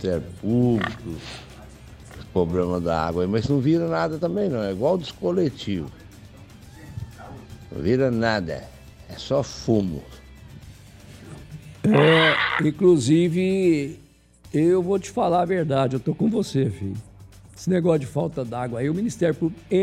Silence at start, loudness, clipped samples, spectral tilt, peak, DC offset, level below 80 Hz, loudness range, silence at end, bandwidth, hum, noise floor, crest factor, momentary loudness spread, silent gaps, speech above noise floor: 0 s; -22 LUFS; under 0.1%; -6.5 dB/octave; -6 dBFS; under 0.1%; -48 dBFS; 8 LU; 0 s; 14.5 kHz; none; -50 dBFS; 18 dB; 20 LU; none; 29 dB